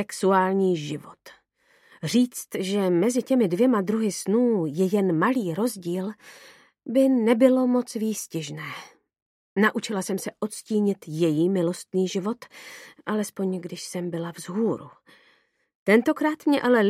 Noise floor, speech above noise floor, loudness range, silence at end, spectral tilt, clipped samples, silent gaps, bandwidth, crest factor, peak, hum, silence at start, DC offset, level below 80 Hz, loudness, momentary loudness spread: -64 dBFS; 40 dB; 6 LU; 0 s; -5.5 dB/octave; under 0.1%; 9.22-9.56 s, 15.75-15.86 s; 15.5 kHz; 20 dB; -6 dBFS; none; 0 s; under 0.1%; -76 dBFS; -24 LUFS; 14 LU